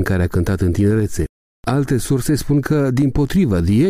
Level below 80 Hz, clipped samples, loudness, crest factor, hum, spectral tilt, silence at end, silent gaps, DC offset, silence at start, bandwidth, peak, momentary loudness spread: -32 dBFS; under 0.1%; -18 LUFS; 10 dB; none; -7 dB/octave; 0 s; 1.29-1.63 s; under 0.1%; 0 s; 16 kHz; -6 dBFS; 6 LU